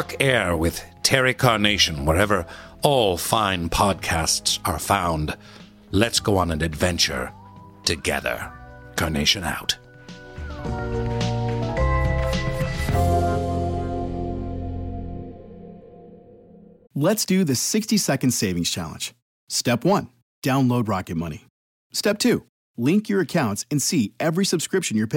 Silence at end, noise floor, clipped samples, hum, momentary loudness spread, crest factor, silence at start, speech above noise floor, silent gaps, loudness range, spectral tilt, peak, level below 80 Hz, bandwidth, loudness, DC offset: 0 s; -48 dBFS; under 0.1%; none; 13 LU; 22 dB; 0 s; 26 dB; 19.22-19.47 s, 20.22-20.42 s, 21.50-21.90 s, 22.49-22.74 s; 6 LU; -4 dB/octave; -2 dBFS; -36 dBFS; 17 kHz; -22 LUFS; under 0.1%